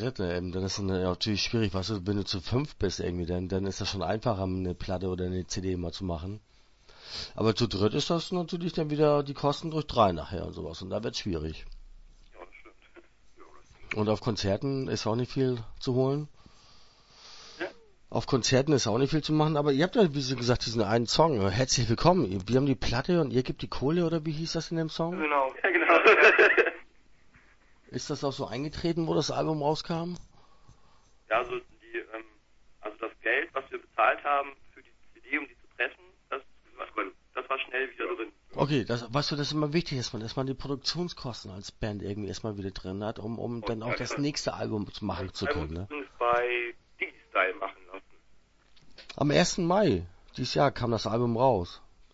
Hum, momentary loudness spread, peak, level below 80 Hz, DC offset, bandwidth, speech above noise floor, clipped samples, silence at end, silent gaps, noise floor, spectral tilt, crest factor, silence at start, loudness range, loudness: none; 14 LU; -6 dBFS; -50 dBFS; under 0.1%; 8 kHz; 32 dB; under 0.1%; 0.35 s; none; -60 dBFS; -5 dB/octave; 24 dB; 0 s; 11 LU; -29 LUFS